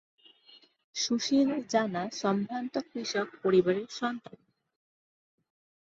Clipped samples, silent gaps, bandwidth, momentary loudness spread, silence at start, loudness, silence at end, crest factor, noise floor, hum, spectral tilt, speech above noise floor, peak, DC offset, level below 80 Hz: under 0.1%; 0.84-0.93 s; 7.8 kHz; 9 LU; 0.5 s; -30 LUFS; 1.65 s; 20 dB; -60 dBFS; none; -4.5 dB/octave; 30 dB; -12 dBFS; under 0.1%; -74 dBFS